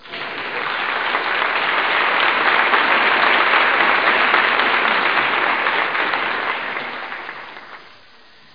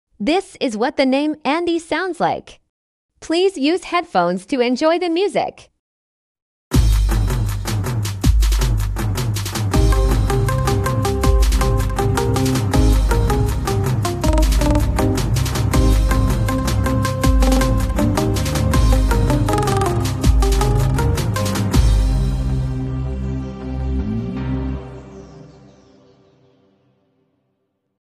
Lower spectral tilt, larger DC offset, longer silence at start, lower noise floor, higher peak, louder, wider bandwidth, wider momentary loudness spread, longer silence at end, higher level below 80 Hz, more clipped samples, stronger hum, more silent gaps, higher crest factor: second, -4 dB/octave vs -6 dB/octave; first, 0.4% vs under 0.1%; second, 0.05 s vs 0.2 s; second, -48 dBFS vs -70 dBFS; about the same, -2 dBFS vs -2 dBFS; about the same, -16 LUFS vs -18 LUFS; second, 5.2 kHz vs 15 kHz; first, 13 LU vs 7 LU; second, 0.65 s vs 2.65 s; second, -62 dBFS vs -20 dBFS; neither; neither; second, none vs 2.69-3.09 s, 5.79-6.35 s, 6.42-6.71 s; about the same, 16 dB vs 14 dB